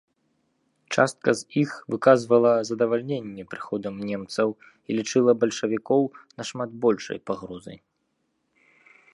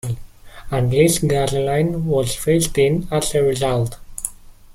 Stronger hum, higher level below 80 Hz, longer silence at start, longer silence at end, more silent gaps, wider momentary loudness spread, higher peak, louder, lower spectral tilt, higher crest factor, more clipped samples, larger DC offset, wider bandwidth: neither; second, -68 dBFS vs -36 dBFS; first, 0.9 s vs 0.05 s; first, 1.4 s vs 0 s; neither; first, 16 LU vs 13 LU; about the same, -4 dBFS vs -2 dBFS; second, -24 LUFS vs -19 LUFS; about the same, -5.5 dB/octave vs -5 dB/octave; first, 22 dB vs 16 dB; neither; neither; second, 11.5 kHz vs 16.5 kHz